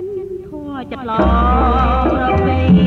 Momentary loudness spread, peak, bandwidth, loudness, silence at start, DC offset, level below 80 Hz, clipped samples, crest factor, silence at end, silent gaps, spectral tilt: 14 LU; -2 dBFS; 4.6 kHz; -15 LUFS; 0 s; under 0.1%; -20 dBFS; under 0.1%; 14 dB; 0 s; none; -9 dB/octave